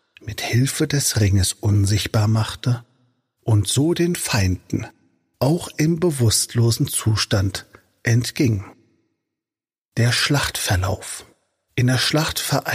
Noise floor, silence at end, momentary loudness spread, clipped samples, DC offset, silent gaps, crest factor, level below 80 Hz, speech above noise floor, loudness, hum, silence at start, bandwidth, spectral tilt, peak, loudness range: under -90 dBFS; 0 s; 10 LU; under 0.1%; under 0.1%; 9.78-9.89 s; 14 dB; -44 dBFS; over 71 dB; -20 LUFS; none; 0.25 s; 15.5 kHz; -4.5 dB/octave; -6 dBFS; 3 LU